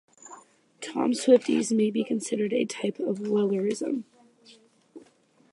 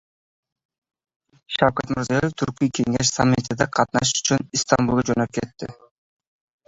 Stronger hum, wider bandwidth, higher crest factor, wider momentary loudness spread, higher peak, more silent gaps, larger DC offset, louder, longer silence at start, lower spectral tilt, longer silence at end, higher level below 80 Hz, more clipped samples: neither; first, 11.5 kHz vs 8 kHz; about the same, 20 dB vs 22 dB; first, 16 LU vs 9 LU; second, -8 dBFS vs -2 dBFS; neither; neither; second, -26 LUFS vs -21 LUFS; second, 0.25 s vs 1.5 s; about the same, -5 dB/octave vs -4 dB/octave; second, 0.55 s vs 0.95 s; second, -80 dBFS vs -50 dBFS; neither